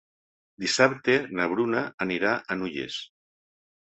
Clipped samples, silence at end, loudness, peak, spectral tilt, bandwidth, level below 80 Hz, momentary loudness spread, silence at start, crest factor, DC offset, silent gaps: under 0.1%; 0.9 s; -26 LUFS; -4 dBFS; -4 dB/octave; 8.4 kHz; -66 dBFS; 12 LU; 0.6 s; 24 dB; under 0.1%; 1.94-1.98 s